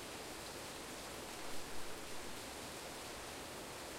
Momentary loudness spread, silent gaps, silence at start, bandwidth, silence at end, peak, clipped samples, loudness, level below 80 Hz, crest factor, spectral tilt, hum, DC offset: 1 LU; none; 0 s; 16 kHz; 0 s; -32 dBFS; under 0.1%; -47 LUFS; -64 dBFS; 14 dB; -2.5 dB/octave; none; under 0.1%